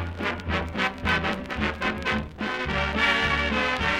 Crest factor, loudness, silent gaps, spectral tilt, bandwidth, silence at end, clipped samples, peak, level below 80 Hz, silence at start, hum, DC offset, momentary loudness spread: 16 dB; -25 LUFS; none; -5 dB/octave; 15.5 kHz; 0 s; under 0.1%; -10 dBFS; -38 dBFS; 0 s; none; under 0.1%; 7 LU